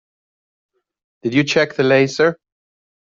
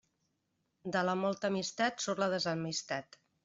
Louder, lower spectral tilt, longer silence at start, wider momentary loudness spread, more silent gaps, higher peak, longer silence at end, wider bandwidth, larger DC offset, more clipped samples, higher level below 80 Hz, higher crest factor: first, -16 LUFS vs -34 LUFS; about the same, -5 dB/octave vs -4 dB/octave; first, 1.25 s vs 0.85 s; about the same, 5 LU vs 7 LU; neither; first, -2 dBFS vs -18 dBFS; first, 0.8 s vs 0.4 s; about the same, 7.6 kHz vs 7.8 kHz; neither; neither; first, -60 dBFS vs -76 dBFS; about the same, 16 dB vs 18 dB